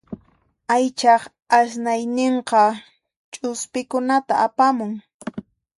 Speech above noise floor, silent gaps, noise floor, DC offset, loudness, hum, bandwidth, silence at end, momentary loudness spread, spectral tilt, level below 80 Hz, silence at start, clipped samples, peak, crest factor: 41 dB; 3.16-3.32 s, 5.14-5.20 s; -60 dBFS; under 0.1%; -20 LUFS; none; 11.5 kHz; 0.35 s; 18 LU; -3.5 dB/octave; -66 dBFS; 0.1 s; under 0.1%; -2 dBFS; 18 dB